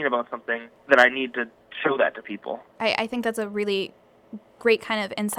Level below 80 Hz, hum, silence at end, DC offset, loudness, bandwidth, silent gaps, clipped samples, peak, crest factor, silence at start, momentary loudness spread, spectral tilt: -68 dBFS; none; 0 s; under 0.1%; -24 LUFS; 18.5 kHz; none; under 0.1%; -2 dBFS; 22 dB; 0 s; 17 LU; -3.5 dB/octave